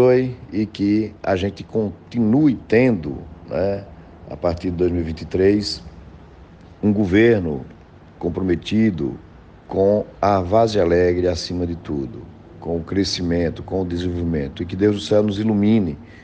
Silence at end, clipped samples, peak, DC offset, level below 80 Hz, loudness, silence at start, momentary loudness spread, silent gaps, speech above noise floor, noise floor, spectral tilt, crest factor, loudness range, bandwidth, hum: 0 s; under 0.1%; -4 dBFS; under 0.1%; -42 dBFS; -20 LUFS; 0 s; 11 LU; none; 24 dB; -43 dBFS; -7 dB/octave; 16 dB; 4 LU; 9 kHz; none